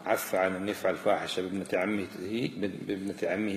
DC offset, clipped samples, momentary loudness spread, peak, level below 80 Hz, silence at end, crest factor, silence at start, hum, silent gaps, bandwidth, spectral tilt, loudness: under 0.1%; under 0.1%; 6 LU; -12 dBFS; -70 dBFS; 0 s; 18 dB; 0 s; none; none; 15 kHz; -5 dB/octave; -31 LUFS